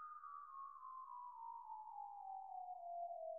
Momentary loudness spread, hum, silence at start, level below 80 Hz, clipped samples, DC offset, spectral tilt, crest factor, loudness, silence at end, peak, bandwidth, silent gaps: 5 LU; none; 0 s; under -90 dBFS; under 0.1%; under 0.1%; 6.5 dB/octave; 12 dB; -53 LUFS; 0 s; -40 dBFS; 2 kHz; none